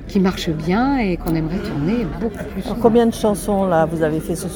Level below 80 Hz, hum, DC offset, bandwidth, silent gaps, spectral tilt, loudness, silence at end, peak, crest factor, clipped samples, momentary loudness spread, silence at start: -34 dBFS; none; under 0.1%; 18 kHz; none; -6.5 dB/octave; -19 LUFS; 0 s; 0 dBFS; 18 dB; under 0.1%; 8 LU; 0 s